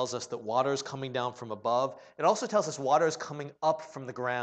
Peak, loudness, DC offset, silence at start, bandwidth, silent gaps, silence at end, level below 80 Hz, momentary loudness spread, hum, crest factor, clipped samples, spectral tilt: -12 dBFS; -30 LUFS; under 0.1%; 0 s; 9 kHz; none; 0 s; -80 dBFS; 9 LU; none; 20 dB; under 0.1%; -4 dB/octave